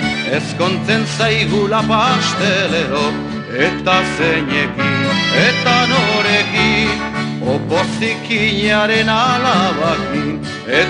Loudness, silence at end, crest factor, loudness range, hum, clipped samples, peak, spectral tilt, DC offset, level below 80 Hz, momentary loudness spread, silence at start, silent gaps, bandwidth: -15 LUFS; 0 s; 14 dB; 2 LU; none; under 0.1%; 0 dBFS; -4.5 dB/octave; under 0.1%; -40 dBFS; 7 LU; 0 s; none; 11 kHz